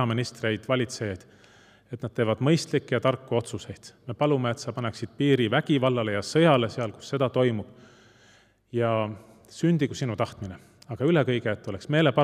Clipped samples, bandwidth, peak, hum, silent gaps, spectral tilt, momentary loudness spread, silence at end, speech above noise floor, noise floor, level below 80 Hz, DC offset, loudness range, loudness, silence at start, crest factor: under 0.1%; 13 kHz; -6 dBFS; none; none; -6 dB/octave; 17 LU; 0 s; 33 dB; -59 dBFS; -66 dBFS; under 0.1%; 4 LU; -26 LUFS; 0 s; 20 dB